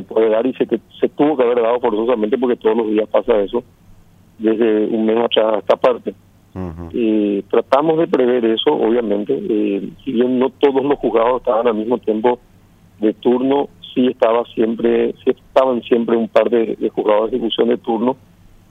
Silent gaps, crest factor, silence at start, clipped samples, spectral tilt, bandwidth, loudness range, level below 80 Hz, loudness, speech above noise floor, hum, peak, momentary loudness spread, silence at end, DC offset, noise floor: none; 16 dB; 0 s; under 0.1%; -7.5 dB/octave; 5.8 kHz; 1 LU; -50 dBFS; -17 LUFS; 32 dB; none; 0 dBFS; 6 LU; 0.55 s; under 0.1%; -48 dBFS